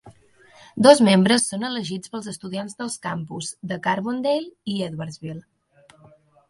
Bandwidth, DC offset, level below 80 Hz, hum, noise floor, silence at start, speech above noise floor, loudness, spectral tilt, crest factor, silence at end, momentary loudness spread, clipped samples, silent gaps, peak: 11.5 kHz; under 0.1%; -64 dBFS; none; -55 dBFS; 0.05 s; 34 dB; -22 LUFS; -4.5 dB/octave; 22 dB; 1.1 s; 18 LU; under 0.1%; none; 0 dBFS